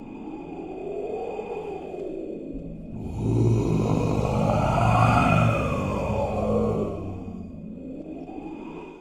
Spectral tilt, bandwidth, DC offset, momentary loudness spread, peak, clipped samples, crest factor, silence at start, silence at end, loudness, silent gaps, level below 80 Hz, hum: -7.5 dB/octave; 11 kHz; under 0.1%; 17 LU; -6 dBFS; under 0.1%; 20 dB; 0 s; 0 s; -25 LUFS; none; -38 dBFS; none